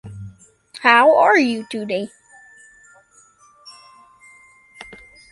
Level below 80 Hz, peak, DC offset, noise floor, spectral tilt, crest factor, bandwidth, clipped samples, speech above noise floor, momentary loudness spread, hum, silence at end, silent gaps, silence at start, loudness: -60 dBFS; -2 dBFS; under 0.1%; -53 dBFS; -4.5 dB/octave; 20 dB; 11.5 kHz; under 0.1%; 38 dB; 28 LU; none; 0.35 s; none; 0.05 s; -15 LUFS